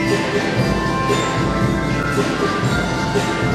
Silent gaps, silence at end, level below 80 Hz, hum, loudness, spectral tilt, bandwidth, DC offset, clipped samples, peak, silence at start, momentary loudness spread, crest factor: none; 0 s; -34 dBFS; none; -18 LUFS; -5.5 dB/octave; 14.5 kHz; under 0.1%; under 0.1%; -4 dBFS; 0 s; 1 LU; 14 dB